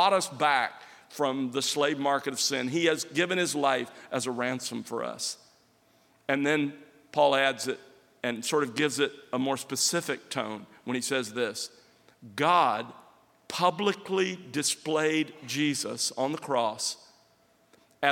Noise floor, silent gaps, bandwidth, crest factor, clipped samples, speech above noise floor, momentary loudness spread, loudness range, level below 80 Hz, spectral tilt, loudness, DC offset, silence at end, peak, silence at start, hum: -65 dBFS; none; 17 kHz; 22 dB; under 0.1%; 36 dB; 10 LU; 3 LU; -82 dBFS; -3 dB/octave; -28 LUFS; under 0.1%; 0 s; -8 dBFS; 0 s; none